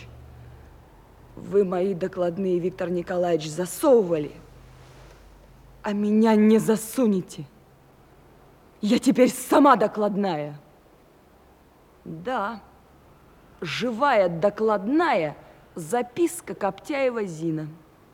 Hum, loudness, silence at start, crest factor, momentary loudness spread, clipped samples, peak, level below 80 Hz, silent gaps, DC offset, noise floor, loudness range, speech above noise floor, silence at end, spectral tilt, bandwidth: none; -23 LUFS; 0 s; 20 dB; 17 LU; under 0.1%; -4 dBFS; -58 dBFS; none; under 0.1%; -55 dBFS; 5 LU; 32 dB; 0.35 s; -5.5 dB/octave; 16.5 kHz